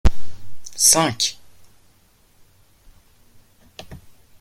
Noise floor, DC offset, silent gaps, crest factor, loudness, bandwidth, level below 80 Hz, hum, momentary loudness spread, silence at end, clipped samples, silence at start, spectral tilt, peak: -56 dBFS; under 0.1%; none; 20 dB; -16 LUFS; 16 kHz; -32 dBFS; none; 28 LU; 0.45 s; under 0.1%; 0.05 s; -2 dB/octave; 0 dBFS